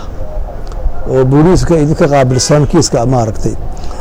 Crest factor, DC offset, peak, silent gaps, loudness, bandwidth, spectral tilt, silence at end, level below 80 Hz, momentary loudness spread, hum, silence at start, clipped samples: 10 dB; under 0.1%; 0 dBFS; none; -10 LUFS; 14.5 kHz; -6 dB/octave; 0 s; -20 dBFS; 16 LU; none; 0 s; under 0.1%